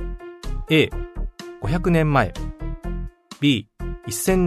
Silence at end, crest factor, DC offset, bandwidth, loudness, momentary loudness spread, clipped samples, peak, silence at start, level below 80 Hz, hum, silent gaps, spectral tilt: 0 s; 18 dB; under 0.1%; 13.5 kHz; -22 LUFS; 16 LU; under 0.1%; -4 dBFS; 0 s; -32 dBFS; none; none; -5.5 dB/octave